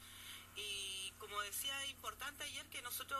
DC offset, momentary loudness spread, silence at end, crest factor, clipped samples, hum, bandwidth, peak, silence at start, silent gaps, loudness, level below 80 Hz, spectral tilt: under 0.1%; 7 LU; 0 s; 18 dB; under 0.1%; none; 15.5 kHz; -30 dBFS; 0 s; none; -44 LUFS; -72 dBFS; 0 dB/octave